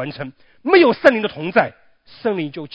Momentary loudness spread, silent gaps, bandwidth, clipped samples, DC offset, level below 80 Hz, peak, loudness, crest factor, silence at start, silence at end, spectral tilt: 16 LU; none; 8 kHz; under 0.1%; under 0.1%; -62 dBFS; 0 dBFS; -17 LUFS; 18 dB; 0 s; 0.05 s; -7 dB/octave